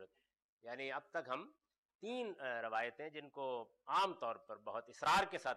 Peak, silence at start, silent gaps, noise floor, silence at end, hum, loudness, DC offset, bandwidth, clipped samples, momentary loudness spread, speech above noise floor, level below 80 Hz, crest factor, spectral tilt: -26 dBFS; 0 s; 0.44-0.59 s, 1.78-1.89 s, 1.95-1.99 s; -64 dBFS; 0 s; none; -41 LUFS; under 0.1%; 12 kHz; under 0.1%; 15 LU; 22 dB; -76 dBFS; 16 dB; -3 dB/octave